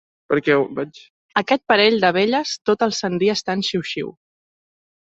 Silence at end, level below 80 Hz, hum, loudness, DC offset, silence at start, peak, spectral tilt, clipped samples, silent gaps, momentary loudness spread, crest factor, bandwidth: 1 s; -62 dBFS; none; -19 LUFS; under 0.1%; 0.3 s; -2 dBFS; -4.5 dB/octave; under 0.1%; 1.10-1.29 s; 12 LU; 20 dB; 8 kHz